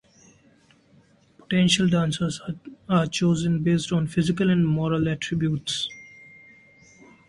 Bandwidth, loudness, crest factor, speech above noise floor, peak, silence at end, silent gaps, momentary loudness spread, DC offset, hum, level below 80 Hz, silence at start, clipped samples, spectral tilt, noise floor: 11.5 kHz; -23 LUFS; 18 dB; 35 dB; -8 dBFS; 1.2 s; none; 12 LU; under 0.1%; none; -54 dBFS; 1.5 s; under 0.1%; -5.5 dB/octave; -58 dBFS